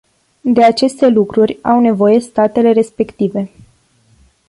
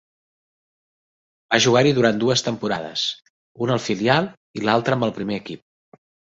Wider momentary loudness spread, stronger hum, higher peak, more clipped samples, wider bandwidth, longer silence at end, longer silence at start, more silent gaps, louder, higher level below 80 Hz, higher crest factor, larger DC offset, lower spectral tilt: second, 8 LU vs 13 LU; neither; about the same, -2 dBFS vs -2 dBFS; neither; first, 11.5 kHz vs 8 kHz; first, 1.05 s vs 0.75 s; second, 0.45 s vs 1.5 s; second, none vs 3.30-3.55 s, 4.37-4.54 s; first, -13 LUFS vs -20 LUFS; first, -52 dBFS vs -60 dBFS; second, 12 dB vs 20 dB; neither; first, -6.5 dB/octave vs -4.5 dB/octave